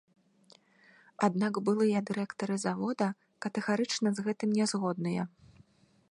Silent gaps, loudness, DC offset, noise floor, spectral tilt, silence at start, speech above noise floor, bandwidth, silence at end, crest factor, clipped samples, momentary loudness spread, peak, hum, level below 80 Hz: none; -32 LUFS; under 0.1%; -63 dBFS; -5.5 dB/octave; 1.2 s; 33 dB; 11 kHz; 0.85 s; 20 dB; under 0.1%; 7 LU; -12 dBFS; none; -76 dBFS